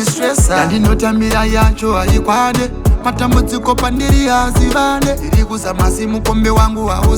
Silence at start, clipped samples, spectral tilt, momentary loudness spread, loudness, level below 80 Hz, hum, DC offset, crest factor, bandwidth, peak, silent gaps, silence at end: 0 s; under 0.1%; -5 dB/octave; 3 LU; -13 LUFS; -16 dBFS; none; under 0.1%; 12 dB; over 20 kHz; 0 dBFS; none; 0 s